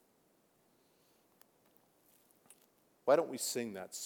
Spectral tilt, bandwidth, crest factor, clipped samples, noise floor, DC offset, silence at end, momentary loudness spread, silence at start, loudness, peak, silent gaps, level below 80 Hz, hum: -3 dB/octave; over 20 kHz; 24 dB; under 0.1%; -73 dBFS; under 0.1%; 0 s; 10 LU; 3.05 s; -35 LUFS; -16 dBFS; none; under -90 dBFS; none